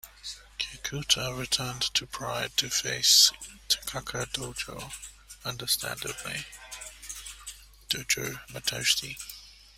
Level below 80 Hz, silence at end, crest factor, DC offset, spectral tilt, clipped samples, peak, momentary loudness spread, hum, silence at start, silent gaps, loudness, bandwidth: -54 dBFS; 0.25 s; 26 dB; under 0.1%; -0.5 dB/octave; under 0.1%; -6 dBFS; 18 LU; none; 0.05 s; none; -27 LUFS; 16 kHz